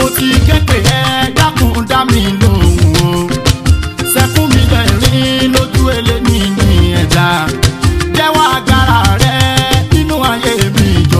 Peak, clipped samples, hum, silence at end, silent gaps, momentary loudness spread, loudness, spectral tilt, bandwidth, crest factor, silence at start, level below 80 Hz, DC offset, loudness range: 0 dBFS; 0.2%; none; 0 s; none; 3 LU; -10 LUFS; -5 dB/octave; 16 kHz; 10 dB; 0 s; -18 dBFS; under 0.1%; 1 LU